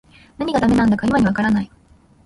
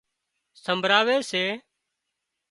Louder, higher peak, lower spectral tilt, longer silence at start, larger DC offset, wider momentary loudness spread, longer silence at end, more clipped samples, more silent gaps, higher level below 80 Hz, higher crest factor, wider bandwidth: first, -18 LUFS vs -23 LUFS; about the same, -4 dBFS vs -4 dBFS; first, -7 dB/octave vs -3 dB/octave; second, 0.4 s vs 0.65 s; neither; second, 9 LU vs 15 LU; second, 0.6 s vs 0.9 s; neither; neither; first, -42 dBFS vs -74 dBFS; second, 14 dB vs 22 dB; about the same, 11.5 kHz vs 11.5 kHz